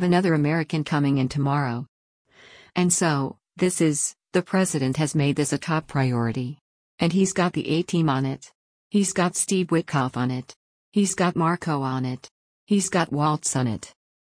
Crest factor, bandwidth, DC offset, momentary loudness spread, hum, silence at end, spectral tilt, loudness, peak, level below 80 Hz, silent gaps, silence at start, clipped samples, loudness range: 16 dB; 10.5 kHz; under 0.1%; 8 LU; none; 0.5 s; -5 dB/octave; -24 LUFS; -8 dBFS; -60 dBFS; 1.89-2.25 s, 6.61-6.98 s, 8.55-8.90 s, 10.56-10.92 s, 12.31-12.67 s; 0 s; under 0.1%; 2 LU